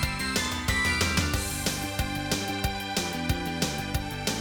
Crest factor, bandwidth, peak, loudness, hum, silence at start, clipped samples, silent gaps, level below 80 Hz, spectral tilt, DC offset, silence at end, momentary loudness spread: 18 dB; over 20 kHz; -10 dBFS; -28 LUFS; none; 0 s; under 0.1%; none; -38 dBFS; -3.5 dB/octave; under 0.1%; 0 s; 6 LU